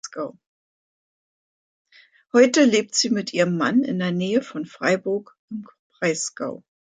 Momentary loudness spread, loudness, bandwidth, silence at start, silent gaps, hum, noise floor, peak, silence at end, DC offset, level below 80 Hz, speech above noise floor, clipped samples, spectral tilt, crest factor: 17 LU; -21 LUFS; 9.4 kHz; 0.05 s; 0.46-1.85 s, 5.39-5.48 s, 5.79-5.90 s; none; under -90 dBFS; -4 dBFS; 0.3 s; under 0.1%; -72 dBFS; over 69 dB; under 0.1%; -4 dB/octave; 20 dB